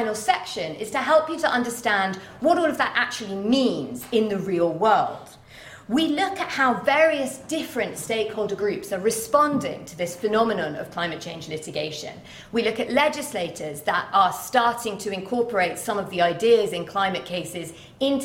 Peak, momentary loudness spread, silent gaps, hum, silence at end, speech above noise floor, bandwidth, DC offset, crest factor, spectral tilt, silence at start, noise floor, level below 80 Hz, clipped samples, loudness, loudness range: -4 dBFS; 11 LU; none; none; 0 s; 21 dB; 16.5 kHz; under 0.1%; 18 dB; -4 dB/octave; 0 s; -45 dBFS; -60 dBFS; under 0.1%; -23 LUFS; 3 LU